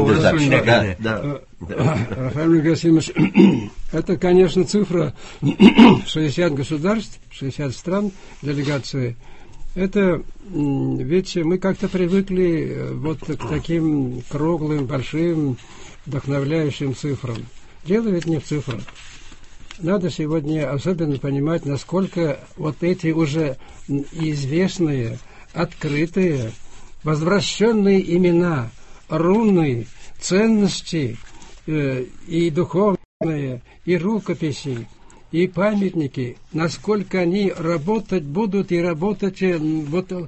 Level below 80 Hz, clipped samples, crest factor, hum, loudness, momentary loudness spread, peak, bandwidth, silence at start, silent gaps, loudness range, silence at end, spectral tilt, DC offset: -44 dBFS; under 0.1%; 20 dB; none; -20 LUFS; 12 LU; 0 dBFS; 8.4 kHz; 0 s; 33.05-33.20 s; 7 LU; 0 s; -6.5 dB/octave; under 0.1%